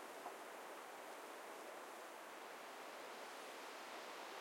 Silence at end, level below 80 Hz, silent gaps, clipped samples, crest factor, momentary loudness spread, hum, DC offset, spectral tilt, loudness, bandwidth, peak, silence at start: 0 s; under -90 dBFS; none; under 0.1%; 16 dB; 2 LU; none; under 0.1%; -1 dB/octave; -53 LUFS; 16.5 kHz; -38 dBFS; 0 s